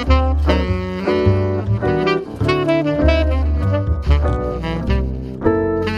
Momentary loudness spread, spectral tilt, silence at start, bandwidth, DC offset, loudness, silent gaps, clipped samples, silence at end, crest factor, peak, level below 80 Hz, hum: 5 LU; -8 dB/octave; 0 s; 7 kHz; under 0.1%; -18 LUFS; none; under 0.1%; 0 s; 16 dB; -2 dBFS; -22 dBFS; none